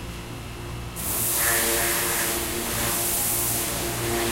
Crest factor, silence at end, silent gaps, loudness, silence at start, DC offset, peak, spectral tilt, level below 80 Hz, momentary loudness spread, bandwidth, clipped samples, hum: 16 dB; 0 s; none; -22 LUFS; 0 s; under 0.1%; -10 dBFS; -2 dB/octave; -40 dBFS; 15 LU; 16 kHz; under 0.1%; none